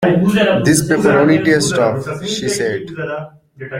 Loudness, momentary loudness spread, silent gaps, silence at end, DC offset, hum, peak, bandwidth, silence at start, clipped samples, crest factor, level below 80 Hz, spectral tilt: -14 LUFS; 12 LU; none; 0 s; under 0.1%; none; 0 dBFS; 16.5 kHz; 0 s; under 0.1%; 14 dB; -48 dBFS; -5 dB/octave